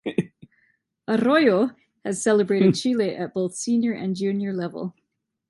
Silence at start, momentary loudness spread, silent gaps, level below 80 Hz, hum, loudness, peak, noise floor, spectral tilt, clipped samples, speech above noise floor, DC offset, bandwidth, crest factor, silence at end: 0.05 s; 15 LU; none; -68 dBFS; none; -23 LUFS; -6 dBFS; -67 dBFS; -5.5 dB/octave; under 0.1%; 45 dB; under 0.1%; 11.5 kHz; 18 dB; 0.6 s